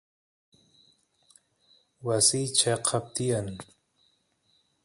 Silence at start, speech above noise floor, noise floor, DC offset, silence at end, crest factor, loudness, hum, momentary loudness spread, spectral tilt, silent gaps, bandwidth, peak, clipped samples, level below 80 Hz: 2 s; 43 dB; -70 dBFS; under 0.1%; 1.2 s; 24 dB; -26 LUFS; none; 16 LU; -3 dB/octave; none; 11.5 kHz; -8 dBFS; under 0.1%; -62 dBFS